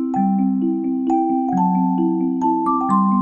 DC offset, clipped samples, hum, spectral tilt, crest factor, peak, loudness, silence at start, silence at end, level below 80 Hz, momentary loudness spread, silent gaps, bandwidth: under 0.1%; under 0.1%; none; -10.5 dB/octave; 12 dB; -6 dBFS; -19 LUFS; 0 s; 0 s; -60 dBFS; 2 LU; none; 8.2 kHz